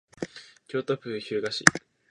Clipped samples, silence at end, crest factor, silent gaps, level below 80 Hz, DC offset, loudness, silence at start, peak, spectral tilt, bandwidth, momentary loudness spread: under 0.1%; 0.3 s; 28 dB; none; -62 dBFS; under 0.1%; -26 LUFS; 0.2 s; 0 dBFS; -3 dB/octave; 12.5 kHz; 18 LU